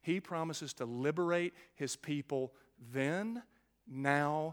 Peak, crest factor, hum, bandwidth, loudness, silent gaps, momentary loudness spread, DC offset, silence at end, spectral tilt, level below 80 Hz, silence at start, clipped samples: -14 dBFS; 22 dB; none; 18 kHz; -37 LUFS; none; 11 LU; under 0.1%; 0 s; -5 dB/octave; -80 dBFS; 0.05 s; under 0.1%